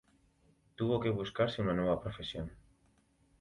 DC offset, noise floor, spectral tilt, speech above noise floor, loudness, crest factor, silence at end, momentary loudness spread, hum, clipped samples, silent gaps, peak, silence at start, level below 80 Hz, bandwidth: under 0.1%; -71 dBFS; -7.5 dB/octave; 36 dB; -35 LUFS; 20 dB; 0.85 s; 10 LU; none; under 0.1%; none; -16 dBFS; 0.8 s; -58 dBFS; 11.5 kHz